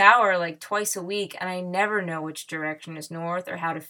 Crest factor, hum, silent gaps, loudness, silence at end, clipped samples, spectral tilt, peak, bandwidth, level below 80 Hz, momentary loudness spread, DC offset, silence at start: 24 dB; none; none; -26 LUFS; 0 s; under 0.1%; -3 dB/octave; 0 dBFS; 19.5 kHz; -82 dBFS; 11 LU; under 0.1%; 0 s